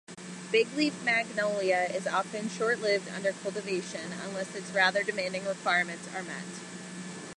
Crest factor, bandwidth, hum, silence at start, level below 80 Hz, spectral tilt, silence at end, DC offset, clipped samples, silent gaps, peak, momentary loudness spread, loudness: 20 dB; 11.5 kHz; none; 0.1 s; -78 dBFS; -3.5 dB/octave; 0.05 s; under 0.1%; under 0.1%; none; -10 dBFS; 14 LU; -30 LUFS